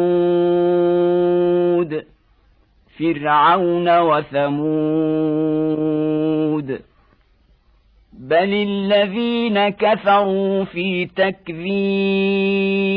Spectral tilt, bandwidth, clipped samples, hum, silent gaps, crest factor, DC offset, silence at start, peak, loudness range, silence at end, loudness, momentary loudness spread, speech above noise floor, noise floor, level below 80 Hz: -9.5 dB/octave; 5 kHz; under 0.1%; none; none; 14 dB; under 0.1%; 0 s; -4 dBFS; 4 LU; 0 s; -18 LUFS; 6 LU; 38 dB; -56 dBFS; -56 dBFS